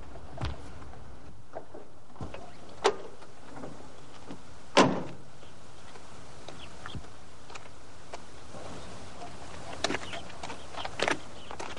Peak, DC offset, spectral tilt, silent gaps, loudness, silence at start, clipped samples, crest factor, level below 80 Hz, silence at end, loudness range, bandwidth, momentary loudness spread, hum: -6 dBFS; 2%; -4 dB/octave; none; -34 LUFS; 0 s; under 0.1%; 32 dB; -54 dBFS; 0 s; 14 LU; 11.5 kHz; 20 LU; none